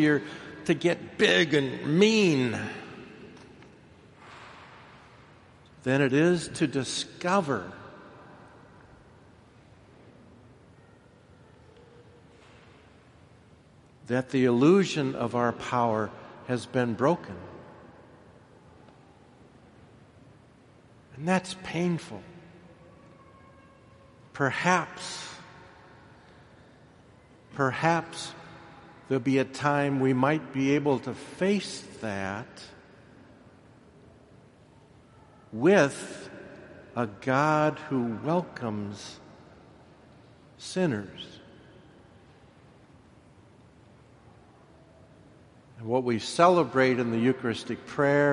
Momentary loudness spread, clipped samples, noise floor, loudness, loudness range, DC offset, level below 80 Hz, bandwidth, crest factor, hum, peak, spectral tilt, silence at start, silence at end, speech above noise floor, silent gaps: 25 LU; under 0.1%; -56 dBFS; -27 LUFS; 11 LU; under 0.1%; -66 dBFS; 11.5 kHz; 24 dB; none; -6 dBFS; -5.5 dB/octave; 0 s; 0 s; 30 dB; none